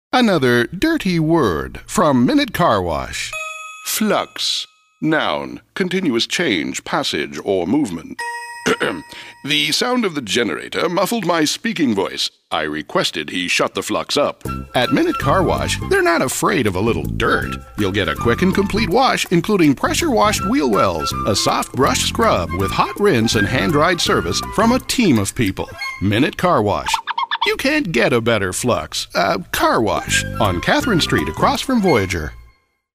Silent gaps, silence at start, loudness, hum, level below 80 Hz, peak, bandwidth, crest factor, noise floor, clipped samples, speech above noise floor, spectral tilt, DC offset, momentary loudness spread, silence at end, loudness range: none; 0.15 s; -17 LUFS; none; -38 dBFS; -2 dBFS; 16 kHz; 16 dB; -52 dBFS; under 0.1%; 35 dB; -4 dB/octave; under 0.1%; 7 LU; 0.55 s; 4 LU